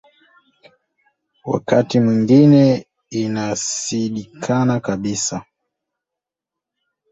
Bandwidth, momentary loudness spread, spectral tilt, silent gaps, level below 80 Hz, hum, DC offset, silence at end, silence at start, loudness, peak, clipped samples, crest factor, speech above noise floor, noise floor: 8.2 kHz; 13 LU; -6 dB/octave; none; -56 dBFS; none; under 0.1%; 1.7 s; 1.45 s; -17 LUFS; -2 dBFS; under 0.1%; 18 dB; 69 dB; -85 dBFS